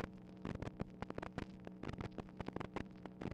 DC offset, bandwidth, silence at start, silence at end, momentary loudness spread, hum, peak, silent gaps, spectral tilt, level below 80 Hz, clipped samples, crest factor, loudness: under 0.1%; 11 kHz; 0 s; 0 s; 4 LU; none; -24 dBFS; none; -7.5 dB/octave; -60 dBFS; under 0.1%; 24 dB; -49 LUFS